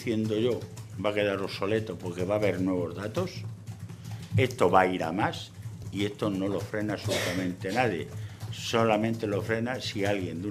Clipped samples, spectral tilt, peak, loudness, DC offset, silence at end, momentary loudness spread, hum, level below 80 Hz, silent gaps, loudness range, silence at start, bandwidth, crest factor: under 0.1%; -5.5 dB/octave; -6 dBFS; -29 LUFS; under 0.1%; 0 s; 14 LU; none; -60 dBFS; none; 3 LU; 0 s; 14.5 kHz; 22 dB